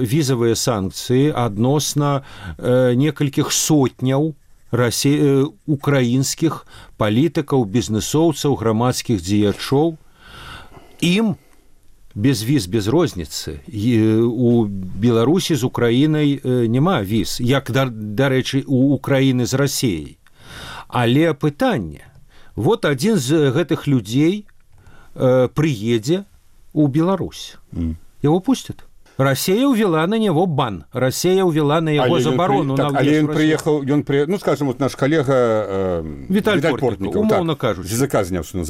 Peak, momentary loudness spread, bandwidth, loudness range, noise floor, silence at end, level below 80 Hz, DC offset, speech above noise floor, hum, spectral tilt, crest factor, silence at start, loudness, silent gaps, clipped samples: -4 dBFS; 9 LU; 16 kHz; 4 LU; -46 dBFS; 0 s; -44 dBFS; under 0.1%; 29 dB; none; -5.5 dB/octave; 14 dB; 0 s; -18 LUFS; none; under 0.1%